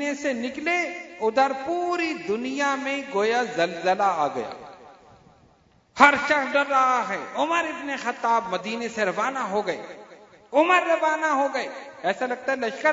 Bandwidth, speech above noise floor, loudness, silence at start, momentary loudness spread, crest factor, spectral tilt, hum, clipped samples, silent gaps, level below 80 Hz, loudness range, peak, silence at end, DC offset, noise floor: 8 kHz; 35 dB; -24 LUFS; 0 s; 11 LU; 24 dB; -3.5 dB/octave; none; under 0.1%; none; -68 dBFS; 4 LU; 0 dBFS; 0 s; under 0.1%; -59 dBFS